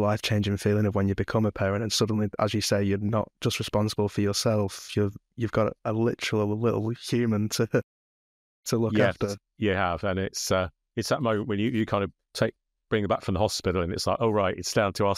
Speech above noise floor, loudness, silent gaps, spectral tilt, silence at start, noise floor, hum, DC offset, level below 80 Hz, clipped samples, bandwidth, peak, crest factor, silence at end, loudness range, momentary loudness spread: over 64 dB; -27 LUFS; 7.83-8.63 s; -5.5 dB/octave; 0 s; under -90 dBFS; none; under 0.1%; -52 dBFS; under 0.1%; 15 kHz; -10 dBFS; 16 dB; 0 s; 2 LU; 5 LU